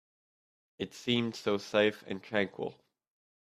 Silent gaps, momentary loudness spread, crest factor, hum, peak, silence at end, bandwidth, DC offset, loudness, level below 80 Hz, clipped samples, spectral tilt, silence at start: none; 13 LU; 20 dB; none; -14 dBFS; 0.75 s; 14 kHz; under 0.1%; -33 LUFS; -74 dBFS; under 0.1%; -5 dB/octave; 0.8 s